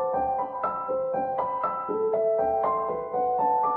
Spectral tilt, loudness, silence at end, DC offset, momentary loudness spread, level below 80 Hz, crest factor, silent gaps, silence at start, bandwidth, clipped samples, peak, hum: -10 dB/octave; -27 LUFS; 0 s; under 0.1%; 4 LU; -60 dBFS; 12 dB; none; 0 s; 4.1 kHz; under 0.1%; -14 dBFS; none